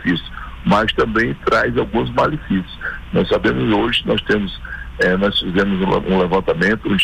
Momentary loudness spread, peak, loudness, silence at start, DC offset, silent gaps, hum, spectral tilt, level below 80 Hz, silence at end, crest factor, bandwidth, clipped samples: 8 LU; -6 dBFS; -17 LUFS; 0 s; under 0.1%; none; none; -6.5 dB/octave; -34 dBFS; 0 s; 12 dB; 10.5 kHz; under 0.1%